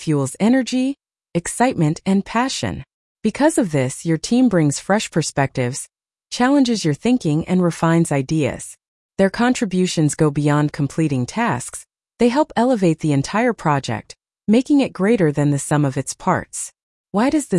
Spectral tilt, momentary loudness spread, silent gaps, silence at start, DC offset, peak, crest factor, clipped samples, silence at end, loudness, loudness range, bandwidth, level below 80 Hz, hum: -5.5 dB/octave; 10 LU; 2.94-3.15 s, 8.88-9.09 s, 16.83-17.04 s; 0 s; under 0.1%; -4 dBFS; 14 dB; under 0.1%; 0 s; -19 LUFS; 1 LU; 12 kHz; -50 dBFS; none